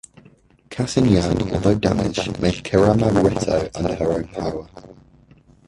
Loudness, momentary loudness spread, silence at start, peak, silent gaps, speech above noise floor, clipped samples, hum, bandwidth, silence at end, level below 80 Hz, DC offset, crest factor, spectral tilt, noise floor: -20 LUFS; 11 LU; 0.7 s; -2 dBFS; none; 33 dB; under 0.1%; none; 11.5 kHz; 0.75 s; -38 dBFS; under 0.1%; 18 dB; -6.5 dB/octave; -52 dBFS